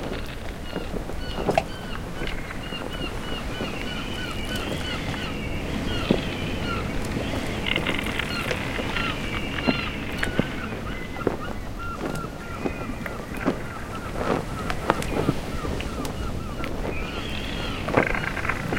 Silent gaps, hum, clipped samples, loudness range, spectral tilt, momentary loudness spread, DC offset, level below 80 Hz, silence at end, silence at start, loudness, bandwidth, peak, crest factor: none; none; under 0.1%; 4 LU; -5 dB/octave; 8 LU; under 0.1%; -36 dBFS; 0 s; 0 s; -28 LUFS; 17 kHz; 0 dBFS; 28 dB